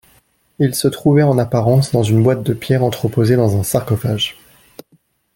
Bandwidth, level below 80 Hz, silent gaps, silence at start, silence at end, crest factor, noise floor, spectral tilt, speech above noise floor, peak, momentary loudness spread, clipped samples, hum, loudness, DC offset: 17 kHz; -48 dBFS; none; 0.6 s; 1.05 s; 14 dB; -57 dBFS; -6.5 dB/octave; 43 dB; -2 dBFS; 6 LU; under 0.1%; none; -15 LUFS; under 0.1%